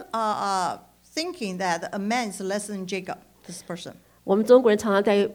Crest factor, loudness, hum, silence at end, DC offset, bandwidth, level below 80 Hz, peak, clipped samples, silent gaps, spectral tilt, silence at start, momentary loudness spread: 20 dB; -24 LUFS; none; 0 s; under 0.1%; 19 kHz; -64 dBFS; -6 dBFS; under 0.1%; none; -4.5 dB/octave; 0 s; 21 LU